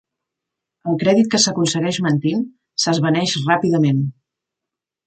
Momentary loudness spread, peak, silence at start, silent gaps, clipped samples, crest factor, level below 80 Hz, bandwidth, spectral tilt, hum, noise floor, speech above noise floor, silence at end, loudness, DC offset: 9 LU; -2 dBFS; 0.85 s; none; under 0.1%; 18 dB; -62 dBFS; 9.2 kHz; -4.5 dB/octave; none; -85 dBFS; 68 dB; 0.95 s; -18 LUFS; under 0.1%